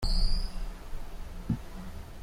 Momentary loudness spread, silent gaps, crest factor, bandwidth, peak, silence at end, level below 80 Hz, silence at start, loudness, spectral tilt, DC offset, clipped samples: 14 LU; none; 16 dB; 13.5 kHz; -16 dBFS; 0 s; -32 dBFS; 0 s; -38 LUFS; -5 dB/octave; under 0.1%; under 0.1%